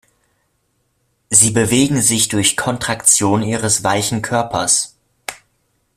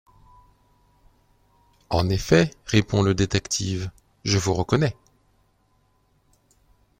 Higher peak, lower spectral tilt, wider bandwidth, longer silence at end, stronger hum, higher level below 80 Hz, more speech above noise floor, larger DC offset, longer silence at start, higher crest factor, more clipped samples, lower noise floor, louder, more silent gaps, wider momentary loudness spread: first, 0 dBFS vs -4 dBFS; second, -3 dB/octave vs -5 dB/octave; about the same, 16 kHz vs 16.5 kHz; second, 0.6 s vs 2.1 s; neither; about the same, -48 dBFS vs -46 dBFS; first, 50 dB vs 43 dB; neither; second, 1.3 s vs 1.9 s; about the same, 18 dB vs 22 dB; neither; about the same, -65 dBFS vs -65 dBFS; first, -14 LUFS vs -23 LUFS; neither; first, 15 LU vs 9 LU